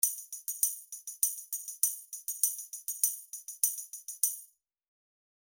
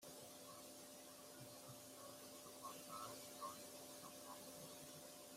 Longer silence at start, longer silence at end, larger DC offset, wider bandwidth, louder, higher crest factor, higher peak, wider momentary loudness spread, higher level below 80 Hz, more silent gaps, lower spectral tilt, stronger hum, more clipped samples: about the same, 0 s vs 0 s; first, 1 s vs 0 s; neither; first, over 20 kHz vs 16 kHz; first, -32 LUFS vs -56 LUFS; first, 26 dB vs 18 dB; first, -10 dBFS vs -40 dBFS; first, 11 LU vs 5 LU; first, -78 dBFS vs -88 dBFS; neither; second, 5.5 dB/octave vs -2.5 dB/octave; neither; neither